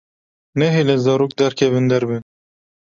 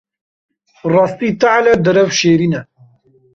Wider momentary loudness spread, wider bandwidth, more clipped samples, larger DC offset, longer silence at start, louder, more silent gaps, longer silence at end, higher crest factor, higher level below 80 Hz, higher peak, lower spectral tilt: about the same, 9 LU vs 7 LU; about the same, 7.6 kHz vs 7.6 kHz; neither; neither; second, 0.55 s vs 0.85 s; second, -17 LUFS vs -13 LUFS; neither; about the same, 0.7 s vs 0.7 s; about the same, 16 dB vs 14 dB; second, -58 dBFS vs -52 dBFS; about the same, -2 dBFS vs -2 dBFS; first, -6.5 dB/octave vs -5 dB/octave